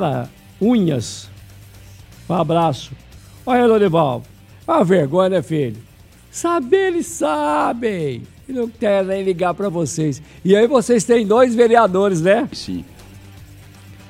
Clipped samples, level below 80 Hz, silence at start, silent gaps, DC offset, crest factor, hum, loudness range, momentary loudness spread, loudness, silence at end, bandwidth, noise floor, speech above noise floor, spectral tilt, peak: under 0.1%; -50 dBFS; 0 s; none; under 0.1%; 18 dB; none; 5 LU; 15 LU; -17 LUFS; 0.15 s; 15.5 kHz; -41 dBFS; 24 dB; -6 dB/octave; 0 dBFS